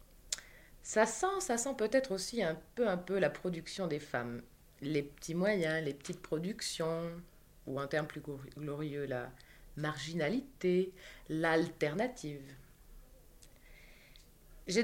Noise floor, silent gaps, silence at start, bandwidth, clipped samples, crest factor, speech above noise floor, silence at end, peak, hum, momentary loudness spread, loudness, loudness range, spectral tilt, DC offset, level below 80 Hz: -59 dBFS; none; 0.15 s; 16.5 kHz; under 0.1%; 22 dB; 23 dB; 0 s; -14 dBFS; none; 13 LU; -36 LUFS; 6 LU; -4.5 dB/octave; under 0.1%; -62 dBFS